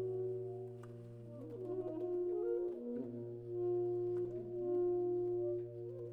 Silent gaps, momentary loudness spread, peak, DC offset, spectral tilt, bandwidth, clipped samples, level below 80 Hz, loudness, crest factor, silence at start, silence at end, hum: none; 13 LU; -30 dBFS; under 0.1%; -11 dB/octave; 2 kHz; under 0.1%; -72 dBFS; -40 LUFS; 10 dB; 0 s; 0 s; none